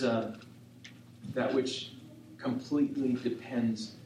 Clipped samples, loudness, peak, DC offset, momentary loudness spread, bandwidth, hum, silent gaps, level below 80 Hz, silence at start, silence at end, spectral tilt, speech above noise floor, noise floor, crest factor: under 0.1%; -33 LUFS; -18 dBFS; under 0.1%; 21 LU; 11.5 kHz; none; none; -76 dBFS; 0 s; 0 s; -6 dB/octave; 20 dB; -52 dBFS; 16 dB